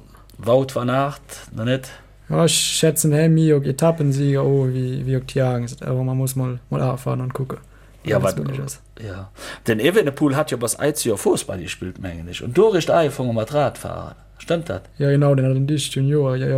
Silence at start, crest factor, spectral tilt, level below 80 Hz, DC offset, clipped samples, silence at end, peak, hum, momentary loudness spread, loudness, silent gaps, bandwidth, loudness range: 0.4 s; 16 dB; -5.5 dB/octave; -48 dBFS; under 0.1%; under 0.1%; 0 s; -4 dBFS; none; 15 LU; -20 LUFS; none; 16.5 kHz; 6 LU